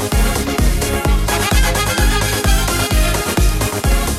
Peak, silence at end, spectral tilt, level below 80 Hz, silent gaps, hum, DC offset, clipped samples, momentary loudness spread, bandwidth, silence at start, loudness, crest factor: -2 dBFS; 0 s; -4 dB/octave; -18 dBFS; none; none; under 0.1%; under 0.1%; 2 LU; 16 kHz; 0 s; -16 LUFS; 12 dB